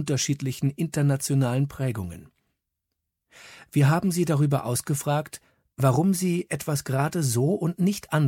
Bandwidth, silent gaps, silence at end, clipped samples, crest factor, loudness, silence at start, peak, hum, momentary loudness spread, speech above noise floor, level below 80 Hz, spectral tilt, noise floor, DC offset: 16.5 kHz; none; 0 s; under 0.1%; 18 dB; -25 LUFS; 0 s; -8 dBFS; none; 7 LU; 58 dB; -58 dBFS; -6 dB/octave; -82 dBFS; under 0.1%